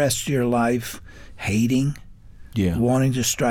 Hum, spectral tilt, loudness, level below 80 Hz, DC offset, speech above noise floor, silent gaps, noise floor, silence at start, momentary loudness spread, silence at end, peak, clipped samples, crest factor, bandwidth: none; -5 dB/octave; -22 LUFS; -44 dBFS; under 0.1%; 21 dB; none; -42 dBFS; 0 s; 12 LU; 0 s; -8 dBFS; under 0.1%; 14 dB; 19 kHz